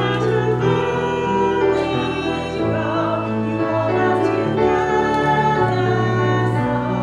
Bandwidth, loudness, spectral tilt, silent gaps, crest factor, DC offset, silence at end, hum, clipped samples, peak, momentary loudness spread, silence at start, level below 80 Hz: 10 kHz; -19 LUFS; -7 dB/octave; none; 14 dB; under 0.1%; 0 s; none; under 0.1%; -4 dBFS; 4 LU; 0 s; -44 dBFS